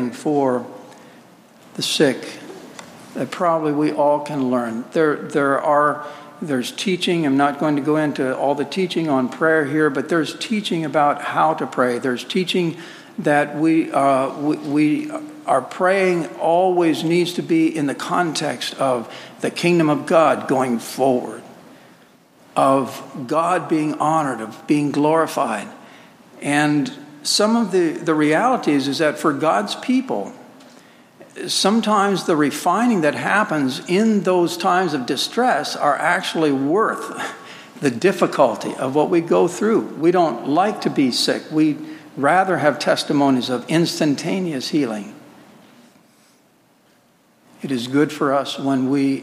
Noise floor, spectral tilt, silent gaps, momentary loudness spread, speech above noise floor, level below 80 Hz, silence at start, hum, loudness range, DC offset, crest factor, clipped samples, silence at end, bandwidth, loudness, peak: -56 dBFS; -5 dB/octave; none; 10 LU; 38 dB; -74 dBFS; 0 s; none; 3 LU; under 0.1%; 18 dB; under 0.1%; 0 s; 15.5 kHz; -19 LUFS; -2 dBFS